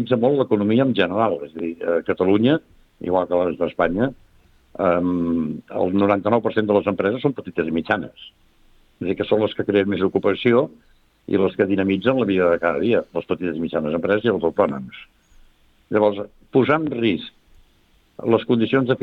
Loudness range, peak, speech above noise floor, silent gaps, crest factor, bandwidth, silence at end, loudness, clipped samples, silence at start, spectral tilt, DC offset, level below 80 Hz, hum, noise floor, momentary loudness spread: 3 LU; -2 dBFS; 38 dB; none; 18 dB; 5.4 kHz; 0 s; -20 LUFS; under 0.1%; 0 s; -9 dB/octave; under 0.1%; -54 dBFS; none; -58 dBFS; 8 LU